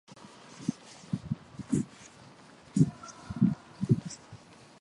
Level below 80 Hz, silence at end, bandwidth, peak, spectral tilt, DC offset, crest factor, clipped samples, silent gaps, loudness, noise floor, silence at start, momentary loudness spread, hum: -60 dBFS; 0.45 s; 11.5 kHz; -10 dBFS; -7 dB/octave; under 0.1%; 24 dB; under 0.1%; none; -32 LUFS; -54 dBFS; 0.55 s; 23 LU; none